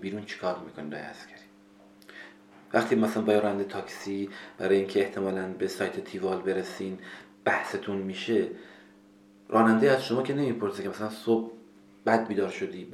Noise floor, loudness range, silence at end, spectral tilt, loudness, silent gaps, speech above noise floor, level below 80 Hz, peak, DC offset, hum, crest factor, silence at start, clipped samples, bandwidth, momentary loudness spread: -56 dBFS; 4 LU; 0 s; -6 dB/octave; -29 LUFS; none; 28 dB; -74 dBFS; -8 dBFS; under 0.1%; none; 22 dB; 0 s; under 0.1%; 13.5 kHz; 17 LU